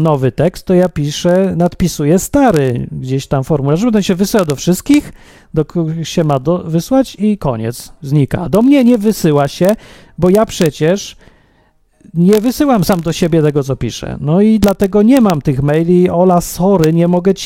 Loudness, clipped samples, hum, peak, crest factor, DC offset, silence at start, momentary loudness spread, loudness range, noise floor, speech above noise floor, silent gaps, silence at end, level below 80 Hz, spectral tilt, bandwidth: -13 LUFS; under 0.1%; none; 0 dBFS; 12 dB; under 0.1%; 0 s; 8 LU; 3 LU; -53 dBFS; 41 dB; none; 0 s; -36 dBFS; -6.5 dB/octave; 16.5 kHz